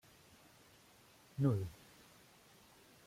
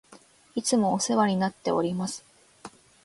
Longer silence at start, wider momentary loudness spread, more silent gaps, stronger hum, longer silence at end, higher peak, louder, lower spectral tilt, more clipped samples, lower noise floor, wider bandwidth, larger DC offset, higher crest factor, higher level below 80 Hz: first, 1.4 s vs 0.1 s; first, 27 LU vs 24 LU; neither; neither; first, 1.35 s vs 0.35 s; second, -22 dBFS vs -10 dBFS; second, -39 LUFS vs -26 LUFS; first, -8 dB/octave vs -4.5 dB/octave; neither; first, -65 dBFS vs -55 dBFS; first, 16 kHz vs 11.5 kHz; neither; about the same, 22 dB vs 18 dB; second, -72 dBFS vs -66 dBFS